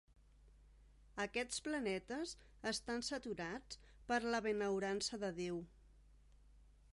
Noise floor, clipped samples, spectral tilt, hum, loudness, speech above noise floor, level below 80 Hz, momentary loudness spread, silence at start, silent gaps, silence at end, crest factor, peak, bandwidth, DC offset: -66 dBFS; under 0.1%; -3.5 dB/octave; 50 Hz at -65 dBFS; -42 LUFS; 24 dB; -66 dBFS; 10 LU; 0.4 s; none; 0.3 s; 20 dB; -24 dBFS; 11.5 kHz; under 0.1%